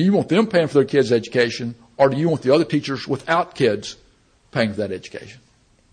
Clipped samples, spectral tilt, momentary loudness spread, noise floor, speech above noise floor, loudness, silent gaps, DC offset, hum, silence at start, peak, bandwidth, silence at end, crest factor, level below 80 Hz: under 0.1%; -6 dB/octave; 12 LU; -54 dBFS; 35 dB; -20 LUFS; none; under 0.1%; none; 0 s; -4 dBFS; 10 kHz; 0.6 s; 16 dB; -58 dBFS